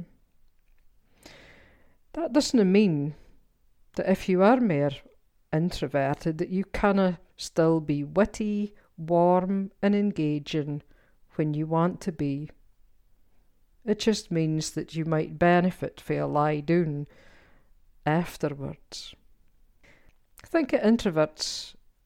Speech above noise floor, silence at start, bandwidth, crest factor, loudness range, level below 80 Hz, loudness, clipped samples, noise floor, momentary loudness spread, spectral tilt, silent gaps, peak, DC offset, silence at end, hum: 35 dB; 0 s; 15.5 kHz; 18 dB; 6 LU; -52 dBFS; -26 LUFS; under 0.1%; -61 dBFS; 15 LU; -6.5 dB/octave; none; -10 dBFS; under 0.1%; 0.35 s; none